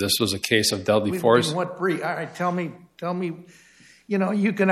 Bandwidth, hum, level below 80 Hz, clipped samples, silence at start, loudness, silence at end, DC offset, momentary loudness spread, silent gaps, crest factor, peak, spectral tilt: 15.5 kHz; none; -62 dBFS; under 0.1%; 0 s; -23 LUFS; 0 s; under 0.1%; 11 LU; none; 20 dB; -4 dBFS; -4.5 dB/octave